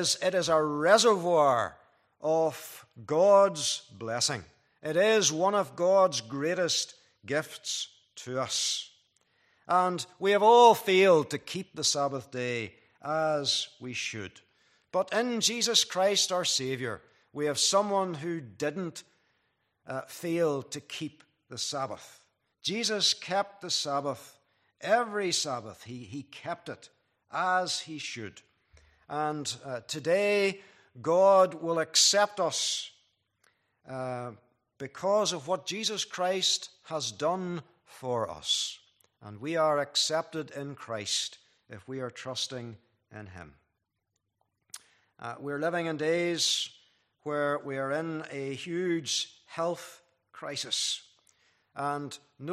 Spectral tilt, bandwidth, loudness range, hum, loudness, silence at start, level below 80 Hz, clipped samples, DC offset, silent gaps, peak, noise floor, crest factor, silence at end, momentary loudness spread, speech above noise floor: -2.5 dB/octave; 15 kHz; 10 LU; none; -28 LUFS; 0 s; -76 dBFS; under 0.1%; under 0.1%; none; -6 dBFS; -82 dBFS; 24 dB; 0 s; 19 LU; 53 dB